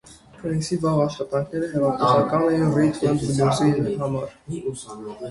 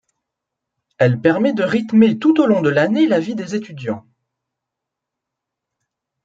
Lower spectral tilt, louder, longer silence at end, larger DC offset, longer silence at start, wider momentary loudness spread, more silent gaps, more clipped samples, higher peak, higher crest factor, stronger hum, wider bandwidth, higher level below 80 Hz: about the same, -6.5 dB/octave vs -7.5 dB/octave; second, -22 LUFS vs -16 LUFS; second, 0 s vs 2.25 s; neither; second, 0.05 s vs 1 s; about the same, 13 LU vs 13 LU; neither; neither; second, -6 dBFS vs -2 dBFS; about the same, 18 dB vs 16 dB; neither; first, 11.5 kHz vs 7.8 kHz; first, -52 dBFS vs -64 dBFS